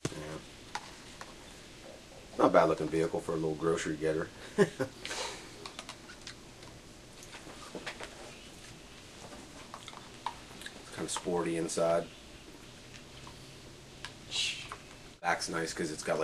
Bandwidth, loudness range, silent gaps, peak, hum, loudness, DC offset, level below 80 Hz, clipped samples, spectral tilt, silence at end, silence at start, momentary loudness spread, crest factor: 14.5 kHz; 15 LU; none; -8 dBFS; none; -34 LUFS; under 0.1%; -60 dBFS; under 0.1%; -4 dB/octave; 0 s; 0.05 s; 19 LU; 28 dB